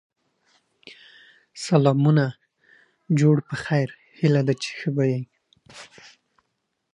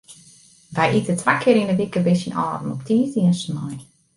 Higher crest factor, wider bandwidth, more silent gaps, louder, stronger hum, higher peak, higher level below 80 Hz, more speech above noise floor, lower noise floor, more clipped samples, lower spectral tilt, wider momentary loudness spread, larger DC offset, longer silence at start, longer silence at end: about the same, 20 dB vs 18 dB; about the same, 10.5 kHz vs 11.5 kHz; neither; about the same, -22 LUFS vs -20 LUFS; neither; about the same, -4 dBFS vs -2 dBFS; second, -68 dBFS vs -58 dBFS; first, 55 dB vs 31 dB; first, -77 dBFS vs -50 dBFS; neither; about the same, -7 dB/octave vs -6.5 dB/octave; first, 24 LU vs 12 LU; neither; first, 1.55 s vs 0.1 s; first, 1.1 s vs 0.35 s